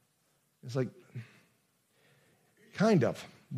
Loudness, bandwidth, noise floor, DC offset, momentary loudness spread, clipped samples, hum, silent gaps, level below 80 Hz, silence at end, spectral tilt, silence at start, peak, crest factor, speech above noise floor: -31 LUFS; 14 kHz; -74 dBFS; under 0.1%; 22 LU; under 0.1%; none; none; -82 dBFS; 0 s; -7 dB/octave; 0.65 s; -14 dBFS; 20 dB; 43 dB